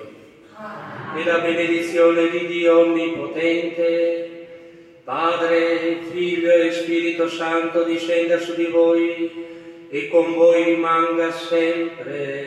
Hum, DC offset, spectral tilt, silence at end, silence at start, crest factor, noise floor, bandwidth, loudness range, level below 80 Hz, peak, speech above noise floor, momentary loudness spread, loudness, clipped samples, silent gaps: none; under 0.1%; -5 dB/octave; 0 s; 0 s; 16 dB; -44 dBFS; 10 kHz; 2 LU; -72 dBFS; -4 dBFS; 25 dB; 14 LU; -19 LUFS; under 0.1%; none